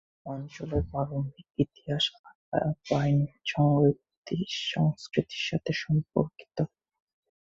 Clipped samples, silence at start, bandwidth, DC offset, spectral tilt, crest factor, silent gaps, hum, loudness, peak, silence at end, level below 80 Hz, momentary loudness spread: under 0.1%; 0.25 s; 7.6 kHz; under 0.1%; -6.5 dB/octave; 20 dB; 2.19-2.24 s, 2.35-2.52 s, 4.17-4.23 s; none; -29 LUFS; -10 dBFS; 0.8 s; -50 dBFS; 10 LU